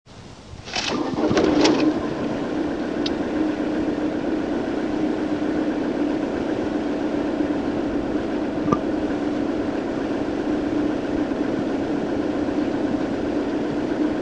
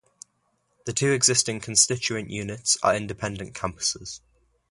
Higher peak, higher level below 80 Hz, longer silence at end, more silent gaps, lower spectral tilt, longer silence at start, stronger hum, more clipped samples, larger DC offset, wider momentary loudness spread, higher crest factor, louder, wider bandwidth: about the same, -2 dBFS vs -4 dBFS; first, -46 dBFS vs -54 dBFS; second, 0 s vs 0.55 s; neither; first, -5.5 dB/octave vs -2.5 dB/octave; second, 0.05 s vs 0.85 s; neither; neither; first, 0.2% vs under 0.1%; second, 4 LU vs 14 LU; about the same, 22 dB vs 22 dB; about the same, -23 LUFS vs -23 LUFS; second, 9 kHz vs 11.5 kHz